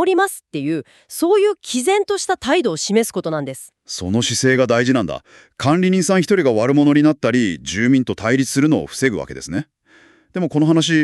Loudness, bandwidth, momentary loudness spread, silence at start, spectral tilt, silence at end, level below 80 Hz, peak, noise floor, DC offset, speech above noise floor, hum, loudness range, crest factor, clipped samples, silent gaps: -17 LUFS; 13.5 kHz; 12 LU; 0 s; -5 dB/octave; 0 s; -52 dBFS; -4 dBFS; -51 dBFS; under 0.1%; 34 dB; none; 3 LU; 14 dB; under 0.1%; none